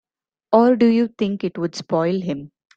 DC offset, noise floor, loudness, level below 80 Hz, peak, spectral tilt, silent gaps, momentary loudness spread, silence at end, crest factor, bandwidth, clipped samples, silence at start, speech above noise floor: under 0.1%; -46 dBFS; -19 LUFS; -62 dBFS; -2 dBFS; -7 dB/octave; none; 12 LU; 0.3 s; 18 dB; 7.8 kHz; under 0.1%; 0.5 s; 27 dB